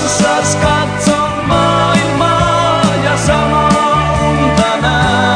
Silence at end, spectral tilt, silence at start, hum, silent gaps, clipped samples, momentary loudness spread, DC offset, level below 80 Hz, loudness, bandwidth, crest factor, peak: 0 s; -4.5 dB/octave; 0 s; none; none; under 0.1%; 2 LU; under 0.1%; -28 dBFS; -11 LUFS; 10.5 kHz; 12 dB; 0 dBFS